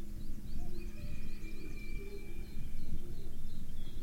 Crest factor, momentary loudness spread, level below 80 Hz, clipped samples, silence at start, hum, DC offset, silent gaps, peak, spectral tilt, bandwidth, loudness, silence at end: 10 dB; 2 LU; -38 dBFS; under 0.1%; 0 s; none; under 0.1%; none; -22 dBFS; -6 dB/octave; 4.9 kHz; -48 LUFS; 0 s